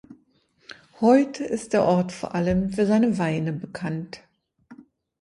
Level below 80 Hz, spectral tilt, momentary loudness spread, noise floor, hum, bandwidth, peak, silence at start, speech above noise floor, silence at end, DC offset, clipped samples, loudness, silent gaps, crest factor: -52 dBFS; -7 dB/octave; 12 LU; -63 dBFS; none; 11.5 kHz; -6 dBFS; 0.1 s; 41 dB; 0.45 s; under 0.1%; under 0.1%; -23 LUFS; none; 18 dB